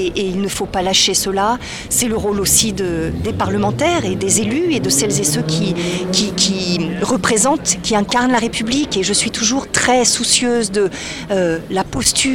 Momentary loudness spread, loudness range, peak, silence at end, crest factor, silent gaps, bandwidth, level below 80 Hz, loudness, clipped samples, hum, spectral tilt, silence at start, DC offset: 7 LU; 1 LU; 0 dBFS; 0 s; 16 dB; none; 18 kHz; -38 dBFS; -16 LUFS; under 0.1%; none; -3 dB/octave; 0 s; under 0.1%